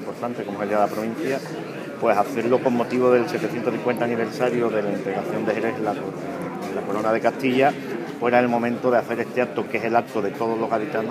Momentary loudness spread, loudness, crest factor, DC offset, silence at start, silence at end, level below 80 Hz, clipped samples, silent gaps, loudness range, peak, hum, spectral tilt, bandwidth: 9 LU; -23 LUFS; 20 dB; under 0.1%; 0 s; 0 s; -72 dBFS; under 0.1%; none; 3 LU; -4 dBFS; none; -6.5 dB/octave; 15.5 kHz